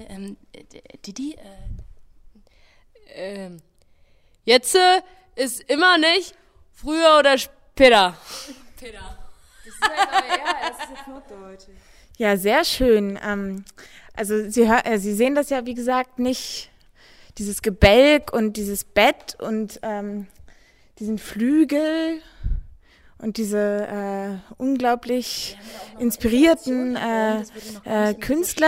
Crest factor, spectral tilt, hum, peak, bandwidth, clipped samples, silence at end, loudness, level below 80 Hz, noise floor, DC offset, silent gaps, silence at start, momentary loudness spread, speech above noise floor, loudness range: 20 dB; -4 dB/octave; none; -2 dBFS; 16 kHz; under 0.1%; 0 s; -20 LUFS; -40 dBFS; -55 dBFS; under 0.1%; none; 0 s; 22 LU; 35 dB; 8 LU